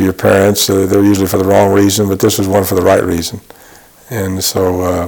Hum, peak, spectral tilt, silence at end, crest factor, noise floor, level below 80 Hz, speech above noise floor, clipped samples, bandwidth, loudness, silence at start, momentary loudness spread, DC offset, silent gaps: none; 0 dBFS; -5 dB/octave; 0 s; 12 dB; -40 dBFS; -40 dBFS; 29 dB; under 0.1%; 19.5 kHz; -11 LUFS; 0 s; 9 LU; under 0.1%; none